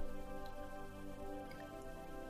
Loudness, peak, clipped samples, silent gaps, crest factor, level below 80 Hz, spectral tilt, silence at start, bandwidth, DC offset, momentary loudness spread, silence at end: -51 LUFS; -30 dBFS; under 0.1%; none; 16 dB; -52 dBFS; -5.5 dB/octave; 0 s; 15.5 kHz; under 0.1%; 2 LU; 0 s